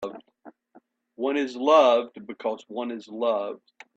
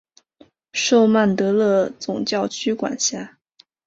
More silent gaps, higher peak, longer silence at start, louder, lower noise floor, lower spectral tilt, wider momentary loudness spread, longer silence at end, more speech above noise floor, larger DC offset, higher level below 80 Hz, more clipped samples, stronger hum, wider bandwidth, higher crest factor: neither; about the same, -6 dBFS vs -4 dBFS; second, 0 s vs 0.75 s; second, -24 LUFS vs -19 LUFS; about the same, -59 dBFS vs -57 dBFS; about the same, -4 dB/octave vs -4 dB/octave; first, 20 LU vs 11 LU; second, 0.4 s vs 0.6 s; about the same, 35 dB vs 38 dB; neither; second, -76 dBFS vs -62 dBFS; neither; neither; about the same, 7.8 kHz vs 8 kHz; about the same, 20 dB vs 16 dB